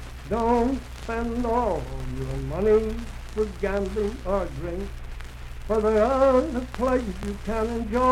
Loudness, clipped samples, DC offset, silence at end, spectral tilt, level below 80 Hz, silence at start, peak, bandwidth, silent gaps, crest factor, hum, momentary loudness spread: -25 LUFS; under 0.1%; under 0.1%; 0 s; -7 dB/octave; -34 dBFS; 0 s; -8 dBFS; 15 kHz; none; 16 dB; none; 13 LU